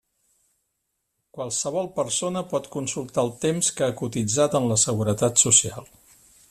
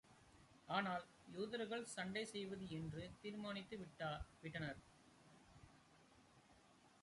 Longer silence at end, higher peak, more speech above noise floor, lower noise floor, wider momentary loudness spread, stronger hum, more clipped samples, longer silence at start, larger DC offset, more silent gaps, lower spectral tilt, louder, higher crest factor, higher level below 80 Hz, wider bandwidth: first, 0.65 s vs 0.05 s; first, -2 dBFS vs -28 dBFS; first, 54 dB vs 22 dB; first, -77 dBFS vs -71 dBFS; second, 12 LU vs 24 LU; neither; neither; first, 1.35 s vs 0.05 s; neither; neither; second, -3.5 dB/octave vs -5 dB/octave; first, -22 LUFS vs -49 LUFS; about the same, 22 dB vs 24 dB; first, -60 dBFS vs -70 dBFS; first, 14.5 kHz vs 11.5 kHz